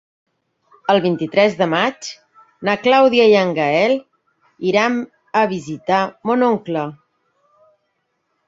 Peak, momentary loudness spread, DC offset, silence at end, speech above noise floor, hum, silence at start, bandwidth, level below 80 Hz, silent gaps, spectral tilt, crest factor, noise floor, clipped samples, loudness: -2 dBFS; 12 LU; under 0.1%; 1.55 s; 54 dB; none; 0.9 s; 7.8 kHz; -62 dBFS; none; -5.5 dB/octave; 18 dB; -70 dBFS; under 0.1%; -17 LUFS